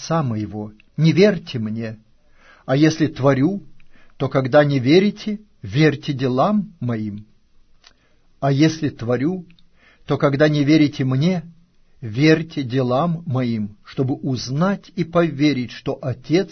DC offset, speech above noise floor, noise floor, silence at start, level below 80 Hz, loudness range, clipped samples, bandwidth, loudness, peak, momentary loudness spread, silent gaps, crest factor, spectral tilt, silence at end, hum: under 0.1%; 36 dB; -55 dBFS; 0 s; -52 dBFS; 4 LU; under 0.1%; 6.6 kHz; -19 LUFS; -2 dBFS; 13 LU; none; 18 dB; -7 dB/octave; 0.05 s; none